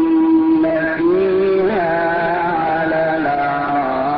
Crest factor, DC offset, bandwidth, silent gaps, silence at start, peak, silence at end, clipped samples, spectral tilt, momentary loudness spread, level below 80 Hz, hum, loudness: 8 dB; under 0.1%; 5.2 kHz; none; 0 s; -6 dBFS; 0 s; under 0.1%; -11.5 dB/octave; 4 LU; -48 dBFS; none; -16 LUFS